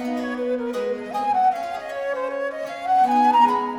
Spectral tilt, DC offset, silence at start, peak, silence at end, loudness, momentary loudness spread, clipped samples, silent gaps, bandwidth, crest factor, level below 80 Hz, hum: -4.5 dB/octave; under 0.1%; 0 s; -6 dBFS; 0 s; -22 LUFS; 12 LU; under 0.1%; none; 16 kHz; 14 dB; -64 dBFS; none